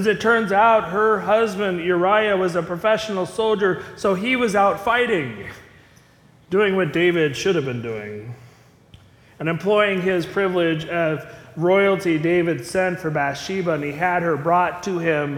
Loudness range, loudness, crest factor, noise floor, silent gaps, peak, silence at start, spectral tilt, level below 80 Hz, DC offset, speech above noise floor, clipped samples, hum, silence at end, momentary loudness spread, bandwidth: 4 LU; -20 LUFS; 16 dB; -52 dBFS; none; -4 dBFS; 0 s; -5.5 dB/octave; -56 dBFS; under 0.1%; 32 dB; under 0.1%; none; 0 s; 8 LU; 16 kHz